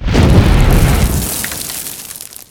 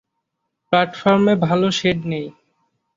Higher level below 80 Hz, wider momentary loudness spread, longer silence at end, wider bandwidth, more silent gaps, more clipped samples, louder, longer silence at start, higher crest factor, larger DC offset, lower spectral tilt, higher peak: first, -16 dBFS vs -54 dBFS; first, 16 LU vs 11 LU; second, 0.15 s vs 0.65 s; first, over 20 kHz vs 7.6 kHz; neither; first, 0.4% vs under 0.1%; first, -13 LUFS vs -18 LUFS; second, 0 s vs 0.7 s; second, 12 dB vs 18 dB; neither; about the same, -5 dB/octave vs -6 dB/octave; about the same, 0 dBFS vs -2 dBFS